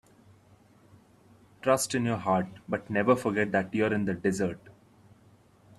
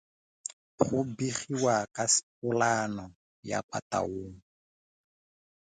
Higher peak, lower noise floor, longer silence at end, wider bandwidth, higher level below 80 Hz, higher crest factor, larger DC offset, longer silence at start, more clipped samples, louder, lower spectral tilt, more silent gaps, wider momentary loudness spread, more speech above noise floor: about the same, -8 dBFS vs -8 dBFS; second, -60 dBFS vs under -90 dBFS; second, 1.1 s vs 1.35 s; first, 14 kHz vs 9.6 kHz; about the same, -64 dBFS vs -62 dBFS; about the same, 22 dB vs 26 dB; neither; first, 1.65 s vs 0.8 s; neither; about the same, -28 LUFS vs -30 LUFS; first, -5.5 dB/octave vs -3.5 dB/octave; second, none vs 2.23-2.42 s, 3.15-3.43 s, 3.63-3.69 s, 3.82-3.90 s; second, 8 LU vs 16 LU; second, 32 dB vs over 60 dB